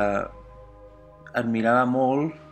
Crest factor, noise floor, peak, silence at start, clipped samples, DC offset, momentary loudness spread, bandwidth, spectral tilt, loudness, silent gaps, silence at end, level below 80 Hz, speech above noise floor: 16 dB; -48 dBFS; -8 dBFS; 0 s; under 0.1%; under 0.1%; 10 LU; 8.8 kHz; -7.5 dB/octave; -24 LUFS; none; 0 s; -52 dBFS; 25 dB